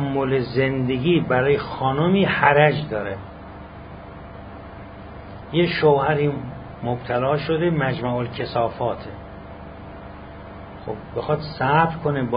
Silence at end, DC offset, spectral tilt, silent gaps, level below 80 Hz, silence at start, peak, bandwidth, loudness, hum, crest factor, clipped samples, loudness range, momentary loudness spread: 0 s; under 0.1%; -11.5 dB/octave; none; -44 dBFS; 0 s; 0 dBFS; 5.2 kHz; -21 LUFS; 50 Hz at -45 dBFS; 22 dB; under 0.1%; 9 LU; 21 LU